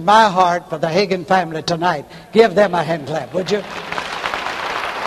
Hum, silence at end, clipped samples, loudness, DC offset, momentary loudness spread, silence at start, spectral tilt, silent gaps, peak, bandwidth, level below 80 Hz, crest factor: none; 0 s; under 0.1%; -18 LUFS; under 0.1%; 10 LU; 0 s; -5 dB/octave; none; 0 dBFS; 13 kHz; -52 dBFS; 18 dB